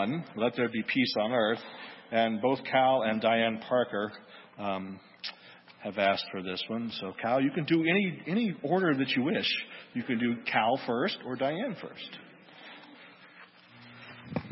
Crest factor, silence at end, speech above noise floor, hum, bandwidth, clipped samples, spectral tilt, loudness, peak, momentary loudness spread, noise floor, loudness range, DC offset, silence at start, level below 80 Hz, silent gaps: 20 dB; 0 s; 25 dB; none; 5.8 kHz; under 0.1%; -9 dB/octave; -30 LUFS; -10 dBFS; 17 LU; -54 dBFS; 6 LU; under 0.1%; 0 s; -74 dBFS; none